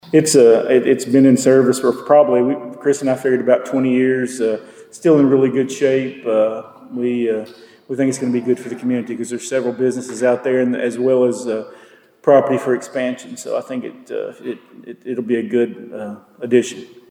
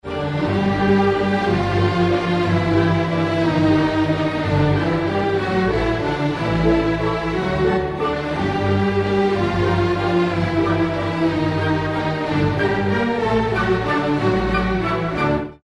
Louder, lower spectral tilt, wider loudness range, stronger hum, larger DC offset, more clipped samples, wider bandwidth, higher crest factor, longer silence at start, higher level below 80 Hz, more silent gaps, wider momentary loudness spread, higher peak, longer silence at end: about the same, -17 LUFS vs -19 LUFS; second, -5.5 dB/octave vs -7.5 dB/octave; first, 8 LU vs 2 LU; neither; neither; neither; first, 16 kHz vs 11 kHz; about the same, 16 dB vs 14 dB; about the same, 0.05 s vs 0.05 s; second, -70 dBFS vs -36 dBFS; neither; first, 16 LU vs 4 LU; about the same, -2 dBFS vs -4 dBFS; first, 0.25 s vs 0.1 s